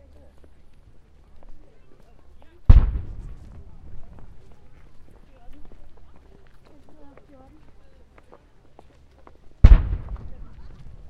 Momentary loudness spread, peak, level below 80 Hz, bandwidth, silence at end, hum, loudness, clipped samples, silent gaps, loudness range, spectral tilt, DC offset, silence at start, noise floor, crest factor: 30 LU; 0 dBFS; -24 dBFS; 4.5 kHz; 0.4 s; none; -20 LUFS; 0.1%; none; 7 LU; -9 dB/octave; under 0.1%; 1.5 s; -50 dBFS; 24 dB